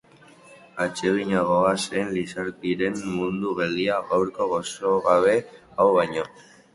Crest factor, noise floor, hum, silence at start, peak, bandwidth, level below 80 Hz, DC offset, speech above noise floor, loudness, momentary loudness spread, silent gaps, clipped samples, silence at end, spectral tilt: 20 dB; -51 dBFS; none; 0.5 s; -4 dBFS; 11.5 kHz; -58 dBFS; under 0.1%; 28 dB; -23 LUFS; 9 LU; none; under 0.1%; 0.35 s; -5 dB/octave